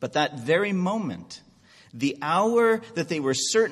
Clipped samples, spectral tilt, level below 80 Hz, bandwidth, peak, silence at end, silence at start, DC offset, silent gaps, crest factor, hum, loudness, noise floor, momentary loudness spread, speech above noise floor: under 0.1%; -4 dB/octave; -66 dBFS; 13 kHz; -8 dBFS; 0 s; 0 s; under 0.1%; none; 16 dB; none; -24 LUFS; -54 dBFS; 13 LU; 30 dB